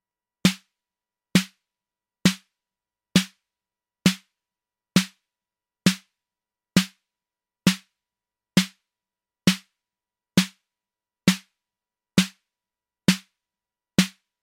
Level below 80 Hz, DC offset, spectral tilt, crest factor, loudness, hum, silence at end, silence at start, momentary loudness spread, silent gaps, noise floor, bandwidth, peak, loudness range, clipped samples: -58 dBFS; under 0.1%; -4 dB/octave; 22 dB; -25 LUFS; none; 0.35 s; 0.45 s; 10 LU; none; under -90 dBFS; 16.5 kHz; -6 dBFS; 1 LU; under 0.1%